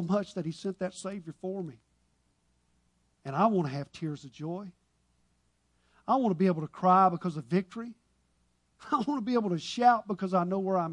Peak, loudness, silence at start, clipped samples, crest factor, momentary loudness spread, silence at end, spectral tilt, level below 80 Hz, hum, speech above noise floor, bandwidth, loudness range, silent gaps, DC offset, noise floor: -12 dBFS; -30 LUFS; 0 s; under 0.1%; 20 dB; 16 LU; 0 s; -7 dB/octave; -72 dBFS; 60 Hz at -60 dBFS; 43 dB; 10.5 kHz; 6 LU; none; under 0.1%; -72 dBFS